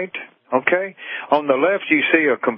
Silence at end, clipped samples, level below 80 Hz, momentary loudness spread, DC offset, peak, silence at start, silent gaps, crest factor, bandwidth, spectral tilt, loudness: 0 s; under 0.1%; -76 dBFS; 13 LU; under 0.1%; 0 dBFS; 0 s; none; 18 dB; 5.4 kHz; -9.5 dB/octave; -18 LUFS